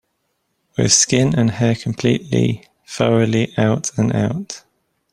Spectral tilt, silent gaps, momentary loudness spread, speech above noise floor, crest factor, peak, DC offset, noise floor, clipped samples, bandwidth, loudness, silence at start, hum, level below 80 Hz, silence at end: -4.5 dB/octave; none; 15 LU; 53 dB; 18 dB; 0 dBFS; under 0.1%; -70 dBFS; under 0.1%; 12 kHz; -17 LUFS; 0.8 s; none; -48 dBFS; 0.55 s